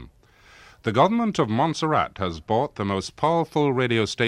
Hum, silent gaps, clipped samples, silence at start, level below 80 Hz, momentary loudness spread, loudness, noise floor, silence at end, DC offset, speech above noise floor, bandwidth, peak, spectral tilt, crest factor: none; none; under 0.1%; 0 s; -54 dBFS; 7 LU; -23 LUFS; -53 dBFS; 0 s; under 0.1%; 31 dB; 12.5 kHz; -4 dBFS; -6 dB/octave; 18 dB